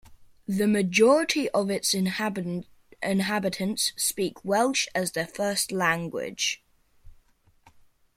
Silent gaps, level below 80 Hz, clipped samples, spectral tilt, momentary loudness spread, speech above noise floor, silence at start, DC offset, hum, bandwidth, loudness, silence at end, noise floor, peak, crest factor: none; -62 dBFS; under 0.1%; -3.5 dB/octave; 12 LU; 35 dB; 0.1 s; under 0.1%; none; 16.5 kHz; -25 LUFS; 1.05 s; -61 dBFS; -8 dBFS; 20 dB